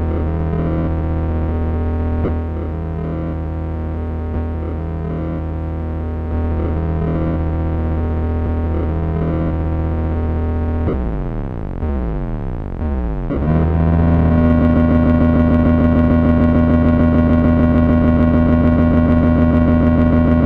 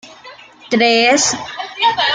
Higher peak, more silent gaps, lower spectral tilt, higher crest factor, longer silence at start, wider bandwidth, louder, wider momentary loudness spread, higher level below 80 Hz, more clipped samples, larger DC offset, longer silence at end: about the same, -2 dBFS vs -2 dBFS; neither; first, -11 dB/octave vs -1.5 dB/octave; about the same, 12 dB vs 14 dB; about the same, 0 s vs 0.05 s; second, 4.2 kHz vs 10 kHz; second, -17 LUFS vs -13 LUFS; about the same, 10 LU vs 11 LU; first, -22 dBFS vs -58 dBFS; neither; neither; about the same, 0 s vs 0 s